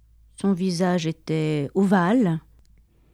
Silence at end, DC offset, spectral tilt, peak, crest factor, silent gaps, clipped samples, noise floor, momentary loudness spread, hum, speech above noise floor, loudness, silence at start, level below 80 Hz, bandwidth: 0.75 s; under 0.1%; -7 dB/octave; -6 dBFS; 16 dB; none; under 0.1%; -56 dBFS; 7 LU; none; 34 dB; -23 LUFS; 0.4 s; -56 dBFS; 12 kHz